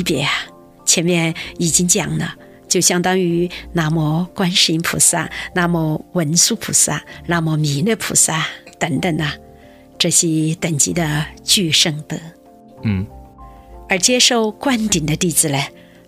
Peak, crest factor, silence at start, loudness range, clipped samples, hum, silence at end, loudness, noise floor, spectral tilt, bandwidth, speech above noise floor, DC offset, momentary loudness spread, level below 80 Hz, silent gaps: 0 dBFS; 18 dB; 0 s; 3 LU; under 0.1%; none; 0.4 s; -16 LUFS; -43 dBFS; -3 dB/octave; 16 kHz; 26 dB; under 0.1%; 10 LU; -44 dBFS; none